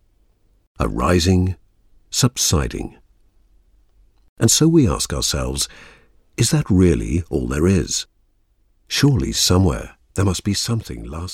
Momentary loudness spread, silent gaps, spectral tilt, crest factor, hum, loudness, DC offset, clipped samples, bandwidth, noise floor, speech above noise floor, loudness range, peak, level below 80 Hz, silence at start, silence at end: 14 LU; 4.29-4.36 s; -4.5 dB/octave; 18 dB; none; -18 LUFS; under 0.1%; under 0.1%; 16.5 kHz; -60 dBFS; 42 dB; 3 LU; -2 dBFS; -34 dBFS; 0.8 s; 0 s